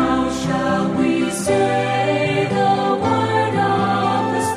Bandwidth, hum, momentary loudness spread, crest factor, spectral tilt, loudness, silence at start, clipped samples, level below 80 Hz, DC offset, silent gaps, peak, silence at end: 15.5 kHz; none; 2 LU; 14 dB; -5.5 dB/octave; -18 LUFS; 0 s; under 0.1%; -46 dBFS; under 0.1%; none; -4 dBFS; 0 s